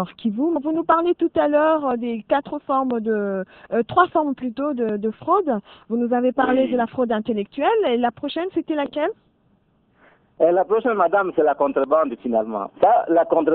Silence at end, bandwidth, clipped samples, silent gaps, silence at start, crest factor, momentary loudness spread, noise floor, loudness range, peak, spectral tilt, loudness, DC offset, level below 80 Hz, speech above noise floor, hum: 0 s; 4.5 kHz; under 0.1%; none; 0 s; 18 dB; 8 LU; -61 dBFS; 4 LU; -2 dBFS; -9.5 dB/octave; -21 LUFS; under 0.1%; -60 dBFS; 41 dB; none